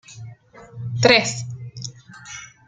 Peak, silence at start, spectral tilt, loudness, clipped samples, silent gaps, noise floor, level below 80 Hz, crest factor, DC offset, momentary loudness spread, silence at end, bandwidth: -2 dBFS; 0.1 s; -3.5 dB/octave; -18 LUFS; under 0.1%; none; -43 dBFS; -58 dBFS; 22 dB; under 0.1%; 26 LU; 0.2 s; 9.6 kHz